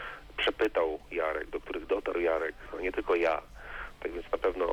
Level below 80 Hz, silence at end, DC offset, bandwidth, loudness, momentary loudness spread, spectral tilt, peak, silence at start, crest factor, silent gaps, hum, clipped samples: -50 dBFS; 0 s; under 0.1%; 18.5 kHz; -32 LUFS; 11 LU; -5 dB/octave; -18 dBFS; 0 s; 14 dB; none; none; under 0.1%